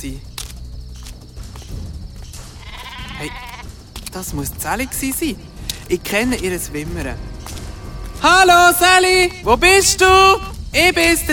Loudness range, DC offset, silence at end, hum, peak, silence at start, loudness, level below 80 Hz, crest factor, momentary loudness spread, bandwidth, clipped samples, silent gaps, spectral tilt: 21 LU; under 0.1%; 0 s; none; 0 dBFS; 0 s; -14 LUFS; -32 dBFS; 18 dB; 25 LU; 19 kHz; under 0.1%; none; -2.5 dB/octave